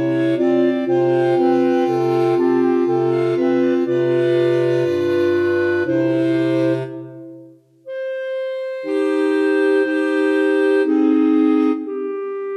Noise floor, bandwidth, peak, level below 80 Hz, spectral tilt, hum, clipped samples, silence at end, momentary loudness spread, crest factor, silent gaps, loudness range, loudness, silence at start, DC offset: -44 dBFS; 9.2 kHz; -6 dBFS; -72 dBFS; -7.5 dB/octave; none; under 0.1%; 0 s; 9 LU; 12 dB; none; 5 LU; -17 LUFS; 0 s; under 0.1%